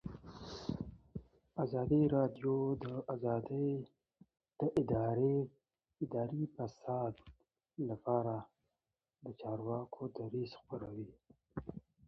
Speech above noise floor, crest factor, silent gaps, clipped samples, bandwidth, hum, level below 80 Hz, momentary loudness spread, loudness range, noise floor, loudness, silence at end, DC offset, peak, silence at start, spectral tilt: over 53 dB; 18 dB; none; under 0.1%; 6.8 kHz; none; -64 dBFS; 18 LU; 6 LU; under -90 dBFS; -39 LUFS; 0.25 s; under 0.1%; -20 dBFS; 0.05 s; -9 dB/octave